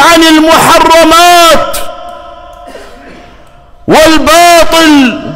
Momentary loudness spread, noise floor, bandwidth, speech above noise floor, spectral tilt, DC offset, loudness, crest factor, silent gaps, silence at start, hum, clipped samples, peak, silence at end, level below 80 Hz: 18 LU; -34 dBFS; 16.5 kHz; 31 dB; -2.5 dB/octave; under 0.1%; -3 LUFS; 6 dB; none; 0 s; none; 1%; 0 dBFS; 0 s; -28 dBFS